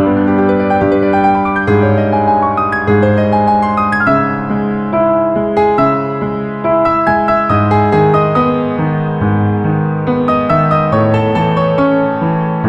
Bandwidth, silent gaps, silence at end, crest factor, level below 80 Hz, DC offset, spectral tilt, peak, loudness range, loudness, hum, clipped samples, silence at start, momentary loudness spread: 8.6 kHz; none; 0 s; 12 dB; -38 dBFS; under 0.1%; -9.5 dB/octave; 0 dBFS; 1 LU; -12 LUFS; none; under 0.1%; 0 s; 4 LU